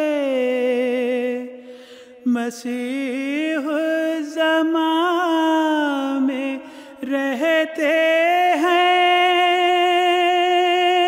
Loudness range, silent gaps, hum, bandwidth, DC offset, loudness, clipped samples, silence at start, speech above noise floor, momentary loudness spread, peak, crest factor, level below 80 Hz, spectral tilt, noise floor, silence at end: 7 LU; none; none; 16 kHz; under 0.1%; -19 LUFS; under 0.1%; 0 s; 22 dB; 10 LU; -8 dBFS; 10 dB; -76 dBFS; -2.5 dB/octave; -42 dBFS; 0 s